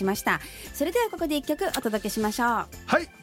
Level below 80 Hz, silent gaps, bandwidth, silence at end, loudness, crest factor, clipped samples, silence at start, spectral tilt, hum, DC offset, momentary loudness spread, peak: -50 dBFS; none; 17 kHz; 0 s; -27 LUFS; 20 dB; under 0.1%; 0 s; -4 dB/octave; none; under 0.1%; 4 LU; -6 dBFS